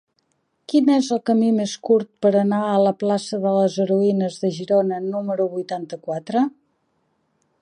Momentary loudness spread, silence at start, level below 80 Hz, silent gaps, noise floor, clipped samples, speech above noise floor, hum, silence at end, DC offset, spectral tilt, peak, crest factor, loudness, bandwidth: 7 LU; 0.7 s; -74 dBFS; none; -69 dBFS; under 0.1%; 49 dB; none; 1.1 s; under 0.1%; -6.5 dB/octave; -6 dBFS; 16 dB; -20 LUFS; 10.5 kHz